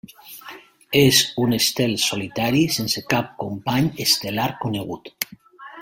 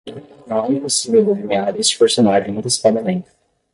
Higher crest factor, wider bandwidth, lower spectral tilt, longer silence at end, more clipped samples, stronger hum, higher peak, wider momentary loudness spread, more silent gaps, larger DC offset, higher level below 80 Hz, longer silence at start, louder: first, 22 dB vs 14 dB; first, 16.5 kHz vs 11.5 kHz; about the same, -3.5 dB/octave vs -4 dB/octave; second, 0 s vs 0.5 s; neither; neither; about the same, 0 dBFS vs -2 dBFS; first, 17 LU vs 9 LU; neither; neither; about the same, -54 dBFS vs -56 dBFS; first, 0.25 s vs 0.05 s; second, -20 LUFS vs -16 LUFS